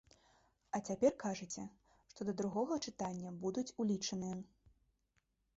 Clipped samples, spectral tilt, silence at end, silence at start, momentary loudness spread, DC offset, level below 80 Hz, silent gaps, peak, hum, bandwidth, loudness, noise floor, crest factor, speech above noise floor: under 0.1%; -5.5 dB/octave; 1.1 s; 0.75 s; 12 LU; under 0.1%; -74 dBFS; none; -20 dBFS; none; 8 kHz; -40 LUFS; -81 dBFS; 20 dB; 42 dB